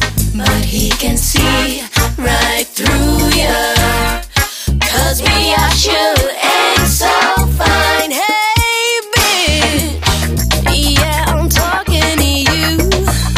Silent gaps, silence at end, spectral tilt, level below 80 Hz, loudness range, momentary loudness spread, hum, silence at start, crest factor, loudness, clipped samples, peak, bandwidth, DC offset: none; 0 s; -3.5 dB/octave; -20 dBFS; 2 LU; 4 LU; none; 0 s; 12 dB; -12 LUFS; under 0.1%; 0 dBFS; 16 kHz; under 0.1%